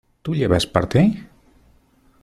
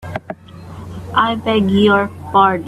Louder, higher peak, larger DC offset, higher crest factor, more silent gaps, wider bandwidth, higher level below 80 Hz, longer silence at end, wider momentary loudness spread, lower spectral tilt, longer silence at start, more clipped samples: second, -19 LUFS vs -15 LUFS; about the same, -2 dBFS vs 0 dBFS; neither; about the same, 20 dB vs 16 dB; neither; first, 13.5 kHz vs 12 kHz; about the same, -44 dBFS vs -48 dBFS; first, 0.95 s vs 0 s; second, 9 LU vs 20 LU; about the same, -6.5 dB/octave vs -7 dB/octave; first, 0.25 s vs 0 s; neither